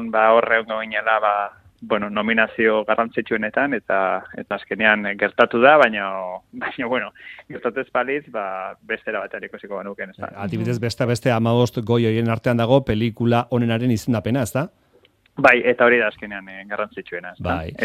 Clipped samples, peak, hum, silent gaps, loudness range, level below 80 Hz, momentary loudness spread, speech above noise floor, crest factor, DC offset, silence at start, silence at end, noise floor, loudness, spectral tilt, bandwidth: under 0.1%; 0 dBFS; none; none; 8 LU; -54 dBFS; 16 LU; 37 dB; 20 dB; under 0.1%; 0 s; 0 s; -57 dBFS; -20 LUFS; -6.5 dB/octave; 14.5 kHz